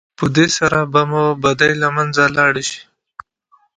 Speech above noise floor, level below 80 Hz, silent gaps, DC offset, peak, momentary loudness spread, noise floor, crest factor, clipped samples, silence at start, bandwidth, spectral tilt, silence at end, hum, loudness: 42 dB; -50 dBFS; none; under 0.1%; 0 dBFS; 6 LU; -57 dBFS; 16 dB; under 0.1%; 0.2 s; 10.5 kHz; -4.5 dB/octave; 0.95 s; none; -15 LUFS